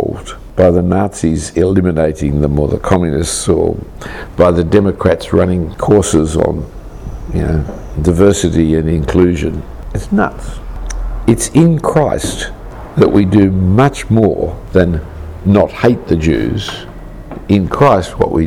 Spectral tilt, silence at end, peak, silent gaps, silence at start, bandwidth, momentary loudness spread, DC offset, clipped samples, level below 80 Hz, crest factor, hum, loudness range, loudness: -6.5 dB/octave; 0 s; 0 dBFS; none; 0 s; 15.5 kHz; 16 LU; under 0.1%; under 0.1%; -26 dBFS; 12 dB; none; 3 LU; -13 LUFS